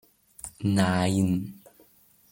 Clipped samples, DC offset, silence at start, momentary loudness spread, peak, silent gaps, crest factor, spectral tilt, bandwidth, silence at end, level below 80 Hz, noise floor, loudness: under 0.1%; under 0.1%; 0.45 s; 18 LU; -10 dBFS; none; 18 dB; -6 dB/octave; 17 kHz; 0.8 s; -60 dBFS; -60 dBFS; -26 LUFS